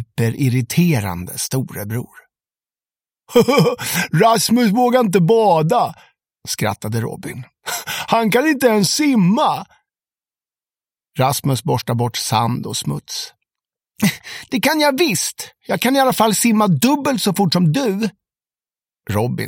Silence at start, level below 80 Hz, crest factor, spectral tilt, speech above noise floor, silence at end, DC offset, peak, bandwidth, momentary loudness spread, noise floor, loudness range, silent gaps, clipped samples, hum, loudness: 0 s; -56 dBFS; 18 dB; -5 dB/octave; over 73 dB; 0 s; under 0.1%; 0 dBFS; 17 kHz; 12 LU; under -90 dBFS; 6 LU; none; under 0.1%; none; -17 LUFS